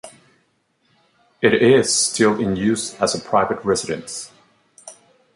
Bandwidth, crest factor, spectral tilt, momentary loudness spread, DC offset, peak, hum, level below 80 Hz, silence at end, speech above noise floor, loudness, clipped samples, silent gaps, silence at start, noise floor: 11.5 kHz; 18 dB; -3.5 dB/octave; 13 LU; under 0.1%; -2 dBFS; none; -54 dBFS; 0.45 s; 47 dB; -18 LUFS; under 0.1%; none; 0.05 s; -65 dBFS